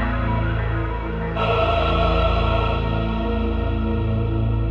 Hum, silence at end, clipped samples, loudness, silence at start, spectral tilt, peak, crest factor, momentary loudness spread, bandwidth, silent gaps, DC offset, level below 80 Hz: none; 0 s; under 0.1%; -22 LUFS; 0 s; -8.5 dB/octave; -8 dBFS; 14 dB; 5 LU; 5.4 kHz; none; under 0.1%; -24 dBFS